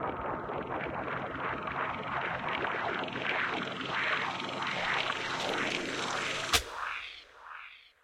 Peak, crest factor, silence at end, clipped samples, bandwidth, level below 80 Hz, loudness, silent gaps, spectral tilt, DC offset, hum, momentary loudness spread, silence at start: -10 dBFS; 24 dB; 0.15 s; under 0.1%; 16 kHz; -58 dBFS; -33 LUFS; none; -2.5 dB/octave; under 0.1%; none; 8 LU; 0 s